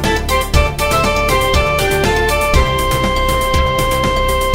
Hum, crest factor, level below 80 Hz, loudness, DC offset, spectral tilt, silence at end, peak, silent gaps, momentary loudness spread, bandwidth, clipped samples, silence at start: none; 14 dB; -20 dBFS; -14 LUFS; under 0.1%; -4 dB/octave; 0 s; 0 dBFS; none; 2 LU; 16.5 kHz; under 0.1%; 0 s